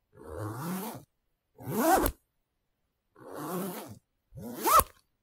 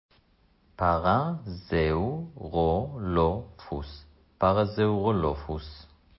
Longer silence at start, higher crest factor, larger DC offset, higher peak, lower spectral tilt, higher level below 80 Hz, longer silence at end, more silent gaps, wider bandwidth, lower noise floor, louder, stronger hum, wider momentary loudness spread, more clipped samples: second, 0.15 s vs 0.8 s; first, 30 dB vs 18 dB; neither; first, -4 dBFS vs -10 dBFS; second, -4 dB/octave vs -11.5 dB/octave; second, -48 dBFS vs -42 dBFS; about the same, 0.35 s vs 0.35 s; neither; first, 16 kHz vs 5.8 kHz; first, -79 dBFS vs -64 dBFS; about the same, -29 LUFS vs -28 LUFS; neither; first, 23 LU vs 13 LU; neither